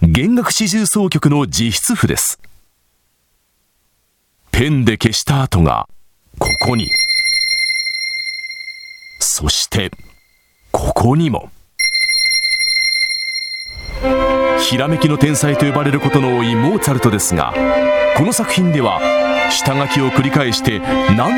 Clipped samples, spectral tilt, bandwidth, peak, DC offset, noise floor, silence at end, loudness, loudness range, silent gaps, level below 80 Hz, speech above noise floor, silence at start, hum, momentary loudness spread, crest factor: under 0.1%; -4 dB/octave; 18 kHz; 0 dBFS; under 0.1%; -62 dBFS; 0 s; -14 LUFS; 4 LU; none; -32 dBFS; 48 dB; 0 s; none; 9 LU; 16 dB